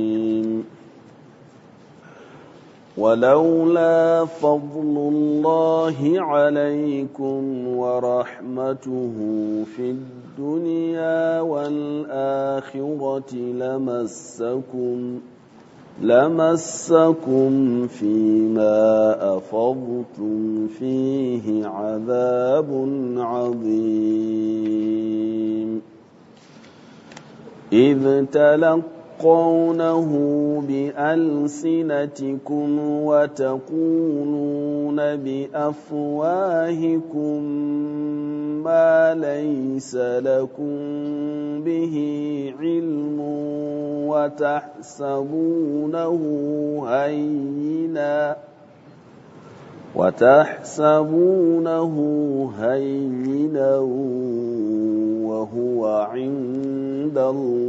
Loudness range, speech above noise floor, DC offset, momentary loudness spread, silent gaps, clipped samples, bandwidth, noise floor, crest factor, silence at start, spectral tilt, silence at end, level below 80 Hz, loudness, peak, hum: 7 LU; 28 dB; under 0.1%; 10 LU; none; under 0.1%; 8 kHz; -48 dBFS; 20 dB; 0 s; -7 dB/octave; 0 s; -70 dBFS; -21 LUFS; 0 dBFS; none